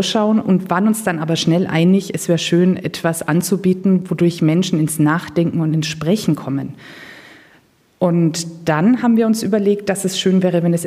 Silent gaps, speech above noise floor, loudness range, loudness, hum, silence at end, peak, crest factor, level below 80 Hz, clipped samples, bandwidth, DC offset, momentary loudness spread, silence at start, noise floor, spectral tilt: none; 37 dB; 4 LU; -17 LUFS; none; 0 s; -2 dBFS; 14 dB; -58 dBFS; under 0.1%; 15.5 kHz; under 0.1%; 6 LU; 0 s; -53 dBFS; -6 dB/octave